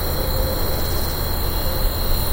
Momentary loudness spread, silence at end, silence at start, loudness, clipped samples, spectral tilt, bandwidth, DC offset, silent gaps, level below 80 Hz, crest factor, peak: 1 LU; 0 s; 0 s; -22 LUFS; under 0.1%; -4.5 dB/octave; 16 kHz; under 0.1%; none; -22 dBFS; 14 dB; -6 dBFS